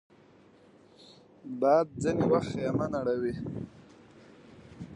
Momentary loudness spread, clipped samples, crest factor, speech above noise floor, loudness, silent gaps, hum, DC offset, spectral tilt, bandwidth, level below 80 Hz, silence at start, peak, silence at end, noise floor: 19 LU; under 0.1%; 20 dB; 30 dB; -29 LUFS; none; none; under 0.1%; -7.5 dB/octave; 10.5 kHz; -60 dBFS; 1 s; -12 dBFS; 0 s; -58 dBFS